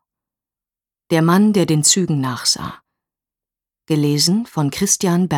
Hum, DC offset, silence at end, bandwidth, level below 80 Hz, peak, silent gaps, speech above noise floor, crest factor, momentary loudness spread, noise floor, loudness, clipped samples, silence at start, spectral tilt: none; under 0.1%; 0 s; 18.5 kHz; -56 dBFS; 0 dBFS; none; over 74 dB; 18 dB; 8 LU; under -90 dBFS; -16 LUFS; under 0.1%; 1.1 s; -4 dB/octave